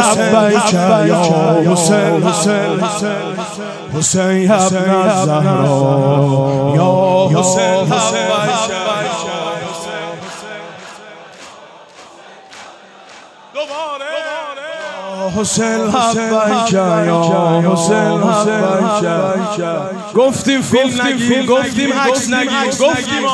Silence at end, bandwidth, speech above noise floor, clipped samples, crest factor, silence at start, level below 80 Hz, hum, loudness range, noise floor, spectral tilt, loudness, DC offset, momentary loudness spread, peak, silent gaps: 0 s; 11 kHz; 26 dB; under 0.1%; 14 dB; 0 s; -54 dBFS; none; 14 LU; -38 dBFS; -4.5 dB/octave; -13 LUFS; under 0.1%; 13 LU; 0 dBFS; none